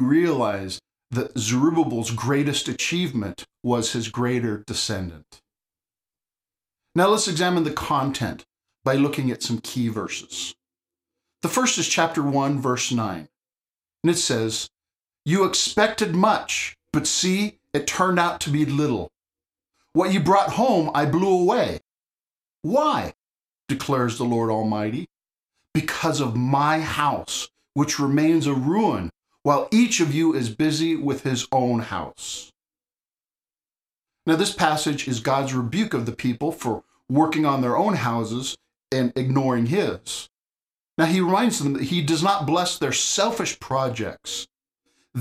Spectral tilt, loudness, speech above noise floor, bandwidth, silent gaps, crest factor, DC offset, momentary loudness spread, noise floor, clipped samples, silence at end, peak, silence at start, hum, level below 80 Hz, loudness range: -4.5 dB/octave; -23 LUFS; over 68 dB; 15.5 kHz; 22.13-22.18 s, 23.35-23.39 s, 40.38-40.44 s, 40.63-40.67 s, 40.80-40.85 s, 40.91-40.95 s; 20 dB; under 0.1%; 11 LU; under -90 dBFS; under 0.1%; 0 s; -4 dBFS; 0 s; none; -56 dBFS; 4 LU